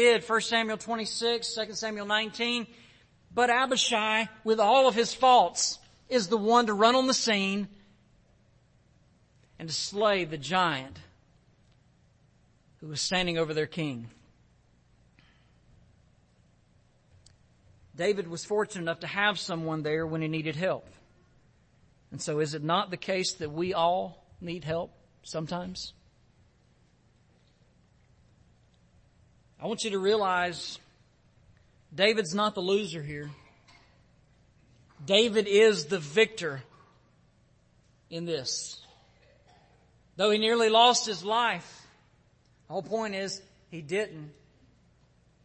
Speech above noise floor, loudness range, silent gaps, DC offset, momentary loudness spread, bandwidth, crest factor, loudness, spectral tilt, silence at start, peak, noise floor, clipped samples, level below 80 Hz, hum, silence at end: 37 dB; 13 LU; none; under 0.1%; 18 LU; 8.8 kHz; 24 dB; -27 LUFS; -3.5 dB/octave; 0 s; -6 dBFS; -64 dBFS; under 0.1%; -64 dBFS; none; 1.15 s